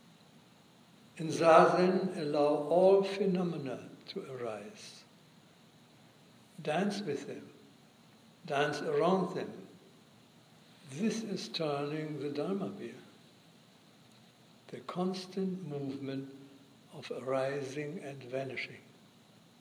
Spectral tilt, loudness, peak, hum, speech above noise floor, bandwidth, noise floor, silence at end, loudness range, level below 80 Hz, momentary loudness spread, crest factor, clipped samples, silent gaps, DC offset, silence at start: -6 dB/octave; -33 LUFS; -10 dBFS; none; 29 dB; 15 kHz; -61 dBFS; 0.8 s; 13 LU; -88 dBFS; 22 LU; 26 dB; under 0.1%; none; under 0.1%; 1.15 s